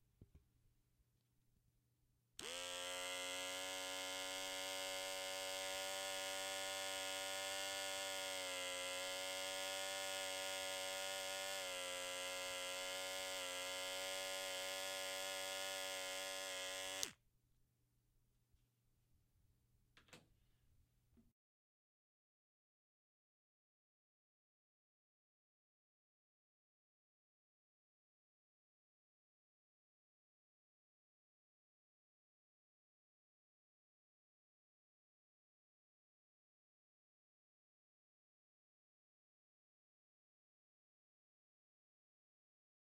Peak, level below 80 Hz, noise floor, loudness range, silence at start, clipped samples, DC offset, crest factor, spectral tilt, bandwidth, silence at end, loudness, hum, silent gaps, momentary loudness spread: -18 dBFS; -84 dBFS; -82 dBFS; 5 LU; 0.2 s; under 0.1%; under 0.1%; 34 dB; 0.5 dB/octave; 16 kHz; 21.65 s; -45 LUFS; none; none; 2 LU